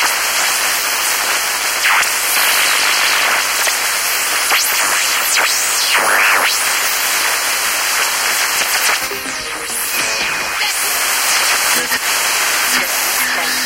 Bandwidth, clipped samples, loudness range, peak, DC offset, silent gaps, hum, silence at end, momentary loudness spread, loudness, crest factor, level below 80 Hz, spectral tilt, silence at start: 16 kHz; under 0.1%; 3 LU; 0 dBFS; under 0.1%; none; none; 0 s; 4 LU; -13 LUFS; 14 dB; -50 dBFS; 2 dB/octave; 0 s